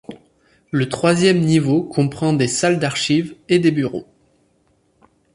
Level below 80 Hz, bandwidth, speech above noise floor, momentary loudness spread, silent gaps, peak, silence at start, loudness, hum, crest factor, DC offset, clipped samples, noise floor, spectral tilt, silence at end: -56 dBFS; 11.5 kHz; 44 dB; 9 LU; none; -2 dBFS; 0.1 s; -18 LUFS; none; 16 dB; under 0.1%; under 0.1%; -61 dBFS; -5.5 dB/octave; 1.35 s